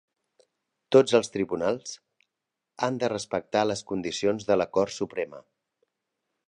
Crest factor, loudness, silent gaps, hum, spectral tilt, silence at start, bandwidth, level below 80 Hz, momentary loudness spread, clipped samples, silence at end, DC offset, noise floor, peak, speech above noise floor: 24 dB; -26 LUFS; none; none; -4.5 dB/octave; 0.9 s; 10.5 kHz; -64 dBFS; 12 LU; under 0.1%; 1.1 s; under 0.1%; -85 dBFS; -4 dBFS; 60 dB